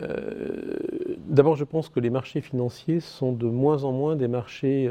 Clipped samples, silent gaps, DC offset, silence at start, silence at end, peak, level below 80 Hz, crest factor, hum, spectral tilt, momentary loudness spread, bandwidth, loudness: under 0.1%; none; under 0.1%; 0 s; 0 s; -4 dBFS; -60 dBFS; 22 dB; none; -8.5 dB/octave; 10 LU; 10 kHz; -26 LUFS